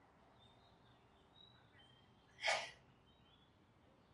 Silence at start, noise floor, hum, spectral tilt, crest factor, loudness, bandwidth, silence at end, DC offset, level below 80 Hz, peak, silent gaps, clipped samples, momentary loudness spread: 2.4 s; -71 dBFS; none; -1 dB/octave; 26 dB; -42 LUFS; 11.5 kHz; 1.4 s; under 0.1%; -82 dBFS; -24 dBFS; none; under 0.1%; 29 LU